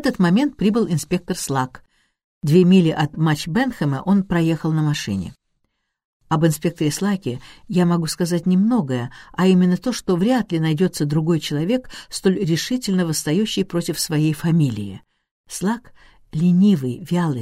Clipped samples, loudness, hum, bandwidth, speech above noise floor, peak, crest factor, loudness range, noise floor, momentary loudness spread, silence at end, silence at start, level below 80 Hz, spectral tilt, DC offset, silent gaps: under 0.1%; -20 LUFS; none; 15.5 kHz; 53 dB; -4 dBFS; 16 dB; 3 LU; -72 dBFS; 10 LU; 0 s; 0 s; -50 dBFS; -6 dB/octave; under 0.1%; 2.24-2.41 s, 6.05-6.20 s, 15.31-15.44 s